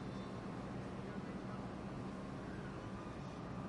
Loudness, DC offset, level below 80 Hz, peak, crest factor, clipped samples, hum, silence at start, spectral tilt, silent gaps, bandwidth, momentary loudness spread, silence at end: -47 LUFS; under 0.1%; -60 dBFS; -34 dBFS; 12 dB; under 0.1%; none; 0 s; -7 dB/octave; none; 11 kHz; 1 LU; 0 s